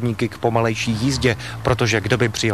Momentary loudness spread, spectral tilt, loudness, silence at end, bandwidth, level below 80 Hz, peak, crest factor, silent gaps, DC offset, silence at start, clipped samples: 4 LU; -5 dB/octave; -20 LUFS; 0 s; 14 kHz; -40 dBFS; -2 dBFS; 16 dB; none; 0.4%; 0 s; under 0.1%